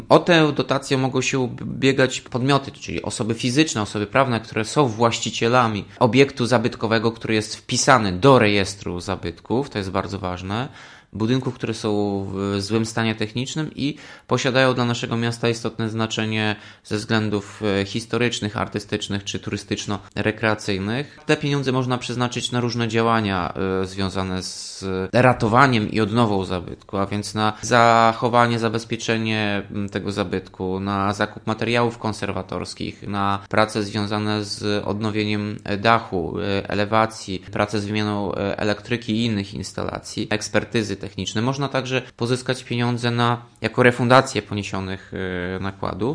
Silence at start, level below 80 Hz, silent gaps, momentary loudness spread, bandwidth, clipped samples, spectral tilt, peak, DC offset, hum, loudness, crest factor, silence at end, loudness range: 0 s; -52 dBFS; none; 11 LU; 10.5 kHz; under 0.1%; -5 dB/octave; 0 dBFS; under 0.1%; none; -22 LUFS; 22 dB; 0 s; 5 LU